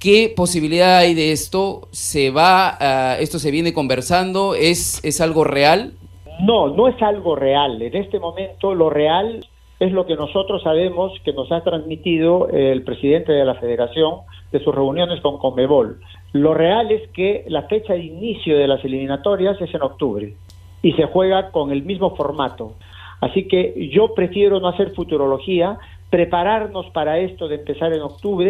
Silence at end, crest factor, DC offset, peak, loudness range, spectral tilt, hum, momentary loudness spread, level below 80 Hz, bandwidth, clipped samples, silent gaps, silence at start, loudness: 0 s; 16 dB; under 0.1%; 0 dBFS; 4 LU; -4.5 dB/octave; none; 9 LU; -44 dBFS; 15.5 kHz; under 0.1%; none; 0 s; -18 LUFS